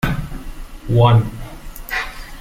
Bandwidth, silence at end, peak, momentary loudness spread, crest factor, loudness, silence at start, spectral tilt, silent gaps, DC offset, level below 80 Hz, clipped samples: 16 kHz; 0 s; -2 dBFS; 22 LU; 18 dB; -17 LUFS; 0 s; -7 dB/octave; none; under 0.1%; -30 dBFS; under 0.1%